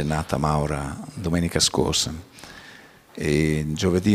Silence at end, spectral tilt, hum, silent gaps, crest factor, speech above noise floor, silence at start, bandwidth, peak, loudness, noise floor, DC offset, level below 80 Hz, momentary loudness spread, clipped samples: 0 s; -4.5 dB/octave; none; none; 20 dB; 25 dB; 0 s; 16 kHz; -4 dBFS; -23 LUFS; -47 dBFS; under 0.1%; -40 dBFS; 21 LU; under 0.1%